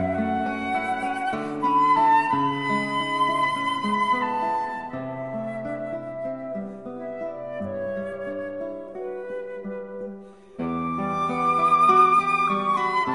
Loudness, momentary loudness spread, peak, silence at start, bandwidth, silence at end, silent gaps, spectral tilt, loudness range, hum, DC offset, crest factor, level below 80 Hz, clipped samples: -24 LUFS; 16 LU; -6 dBFS; 0 s; 11.5 kHz; 0 s; none; -5.5 dB/octave; 11 LU; none; 0.2%; 18 dB; -58 dBFS; under 0.1%